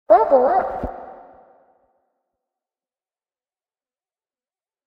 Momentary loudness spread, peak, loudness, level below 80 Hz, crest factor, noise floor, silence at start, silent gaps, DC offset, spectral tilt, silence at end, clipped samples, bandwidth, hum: 24 LU; -2 dBFS; -17 LUFS; -48 dBFS; 22 dB; under -90 dBFS; 0.1 s; none; under 0.1%; -8.5 dB/octave; 3.75 s; under 0.1%; 5.4 kHz; none